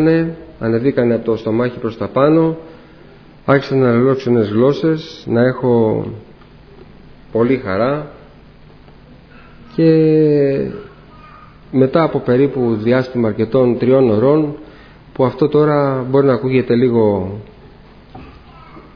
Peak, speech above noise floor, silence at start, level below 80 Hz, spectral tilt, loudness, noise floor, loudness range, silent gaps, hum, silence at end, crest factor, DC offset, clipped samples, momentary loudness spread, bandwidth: 0 dBFS; 27 dB; 0 s; -46 dBFS; -9.5 dB/octave; -15 LUFS; -41 dBFS; 4 LU; none; none; 0.15 s; 16 dB; under 0.1%; under 0.1%; 11 LU; 5.4 kHz